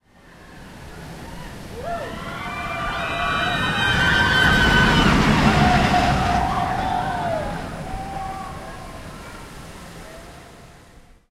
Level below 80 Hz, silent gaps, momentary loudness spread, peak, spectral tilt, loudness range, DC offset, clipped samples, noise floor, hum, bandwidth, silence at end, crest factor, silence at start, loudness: -32 dBFS; none; 23 LU; -4 dBFS; -5 dB/octave; 17 LU; under 0.1%; under 0.1%; -48 dBFS; none; 16 kHz; 0.3 s; 18 dB; 0.4 s; -19 LUFS